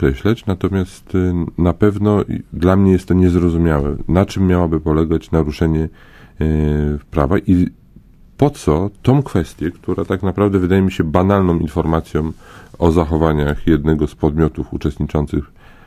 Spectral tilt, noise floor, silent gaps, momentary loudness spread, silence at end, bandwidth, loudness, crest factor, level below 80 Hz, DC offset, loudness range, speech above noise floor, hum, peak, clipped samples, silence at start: -8.5 dB/octave; -44 dBFS; none; 8 LU; 0.4 s; 15.5 kHz; -17 LUFS; 16 dB; -26 dBFS; under 0.1%; 3 LU; 28 dB; none; 0 dBFS; under 0.1%; 0 s